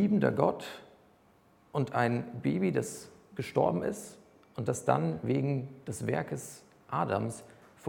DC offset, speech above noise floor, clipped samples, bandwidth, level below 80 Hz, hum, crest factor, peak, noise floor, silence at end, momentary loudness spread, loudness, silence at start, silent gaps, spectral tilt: under 0.1%; 33 dB; under 0.1%; 18 kHz; -68 dBFS; none; 22 dB; -10 dBFS; -64 dBFS; 0 s; 16 LU; -32 LUFS; 0 s; none; -6.5 dB/octave